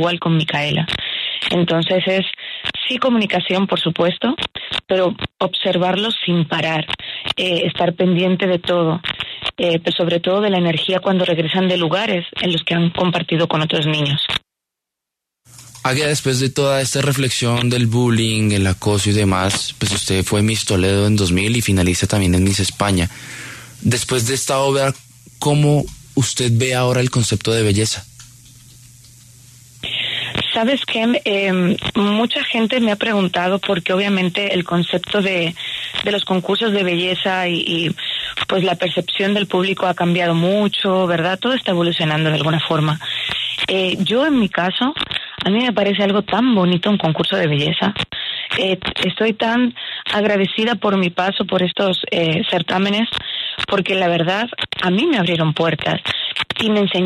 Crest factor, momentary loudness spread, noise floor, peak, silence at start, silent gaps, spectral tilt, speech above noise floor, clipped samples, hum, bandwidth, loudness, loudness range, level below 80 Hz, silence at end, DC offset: 14 dB; 5 LU; -83 dBFS; -2 dBFS; 0 s; none; -4.5 dB/octave; 66 dB; under 0.1%; none; 13.5 kHz; -17 LUFS; 2 LU; -46 dBFS; 0 s; under 0.1%